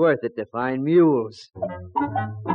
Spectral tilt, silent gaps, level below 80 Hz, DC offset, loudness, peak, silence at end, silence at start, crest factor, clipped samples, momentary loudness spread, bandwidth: -8.5 dB/octave; none; -60 dBFS; under 0.1%; -23 LUFS; -8 dBFS; 0 s; 0 s; 14 dB; under 0.1%; 14 LU; 6.8 kHz